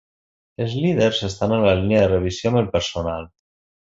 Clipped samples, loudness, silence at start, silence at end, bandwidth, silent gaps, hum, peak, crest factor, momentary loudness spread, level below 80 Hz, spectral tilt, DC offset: under 0.1%; -20 LUFS; 0.6 s; 0.7 s; 8 kHz; none; none; -4 dBFS; 18 dB; 10 LU; -40 dBFS; -6 dB/octave; under 0.1%